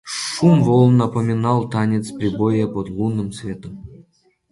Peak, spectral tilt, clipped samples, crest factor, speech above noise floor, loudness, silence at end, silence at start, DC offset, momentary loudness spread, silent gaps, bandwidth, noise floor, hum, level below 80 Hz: -2 dBFS; -7 dB/octave; under 0.1%; 16 dB; 40 dB; -18 LUFS; 0.5 s; 0.05 s; under 0.1%; 17 LU; none; 11.5 kHz; -58 dBFS; none; -48 dBFS